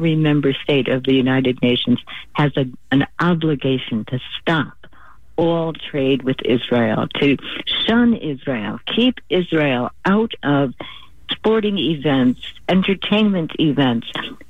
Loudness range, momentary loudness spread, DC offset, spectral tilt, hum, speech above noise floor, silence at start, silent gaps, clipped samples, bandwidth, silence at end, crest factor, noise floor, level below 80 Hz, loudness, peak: 2 LU; 7 LU; 1%; -8 dB/octave; none; 30 dB; 0 s; none; under 0.1%; 7.4 kHz; 0.15 s; 14 dB; -48 dBFS; -48 dBFS; -18 LUFS; -4 dBFS